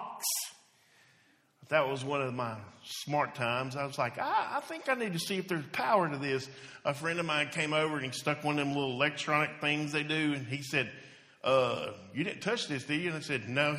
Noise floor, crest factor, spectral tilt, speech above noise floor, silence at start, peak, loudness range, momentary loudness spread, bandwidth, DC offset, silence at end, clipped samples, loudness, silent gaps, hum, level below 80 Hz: -67 dBFS; 20 dB; -4 dB/octave; 35 dB; 0 s; -12 dBFS; 3 LU; 8 LU; 15 kHz; under 0.1%; 0 s; under 0.1%; -32 LUFS; none; none; -74 dBFS